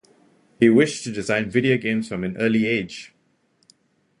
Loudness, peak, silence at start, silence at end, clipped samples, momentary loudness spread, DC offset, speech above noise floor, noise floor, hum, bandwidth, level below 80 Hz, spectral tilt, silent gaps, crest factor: -21 LUFS; -2 dBFS; 0.6 s; 1.15 s; under 0.1%; 12 LU; under 0.1%; 44 dB; -65 dBFS; none; 11 kHz; -58 dBFS; -5.5 dB/octave; none; 20 dB